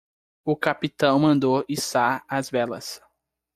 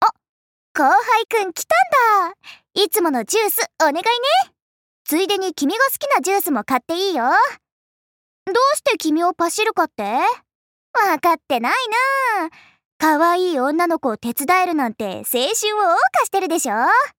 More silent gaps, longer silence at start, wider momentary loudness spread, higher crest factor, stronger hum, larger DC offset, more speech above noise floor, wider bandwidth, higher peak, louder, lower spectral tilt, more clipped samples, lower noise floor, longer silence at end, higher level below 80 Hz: second, none vs 0.29-0.75 s, 4.62-5.05 s, 7.72-8.46 s, 10.55-10.94 s, 12.85-13.00 s; first, 0.45 s vs 0 s; first, 14 LU vs 7 LU; about the same, 18 dB vs 14 dB; neither; neither; second, 47 dB vs over 72 dB; about the same, 16 kHz vs 17 kHz; about the same, -6 dBFS vs -6 dBFS; second, -23 LUFS vs -18 LUFS; first, -5 dB/octave vs -1.5 dB/octave; neither; second, -70 dBFS vs under -90 dBFS; first, 0.6 s vs 0.1 s; first, -62 dBFS vs -70 dBFS